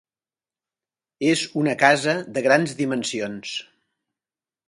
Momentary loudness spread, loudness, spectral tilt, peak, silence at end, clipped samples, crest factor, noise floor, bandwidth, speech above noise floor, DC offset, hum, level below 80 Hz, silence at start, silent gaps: 12 LU; -21 LUFS; -4 dB/octave; 0 dBFS; 1.05 s; under 0.1%; 24 dB; under -90 dBFS; 11.5 kHz; over 69 dB; under 0.1%; none; -68 dBFS; 1.2 s; none